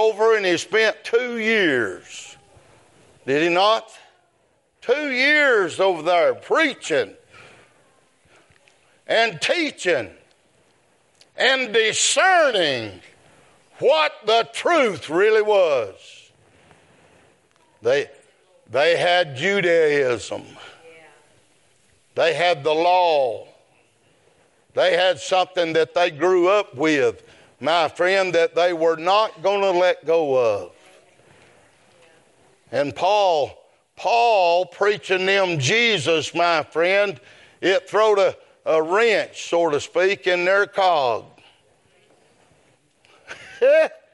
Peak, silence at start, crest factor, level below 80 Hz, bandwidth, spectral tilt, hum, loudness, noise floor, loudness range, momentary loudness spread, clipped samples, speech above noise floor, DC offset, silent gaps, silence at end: -4 dBFS; 0 s; 18 dB; -72 dBFS; 11.5 kHz; -3 dB/octave; none; -19 LUFS; -64 dBFS; 6 LU; 10 LU; under 0.1%; 45 dB; under 0.1%; none; 0.2 s